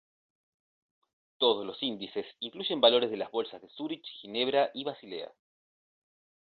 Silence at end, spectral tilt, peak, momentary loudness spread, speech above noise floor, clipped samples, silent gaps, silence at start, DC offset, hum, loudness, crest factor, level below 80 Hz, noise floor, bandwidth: 1.2 s; -7 dB/octave; -10 dBFS; 17 LU; over 59 dB; under 0.1%; none; 1.4 s; under 0.1%; none; -30 LUFS; 24 dB; -78 dBFS; under -90 dBFS; 5 kHz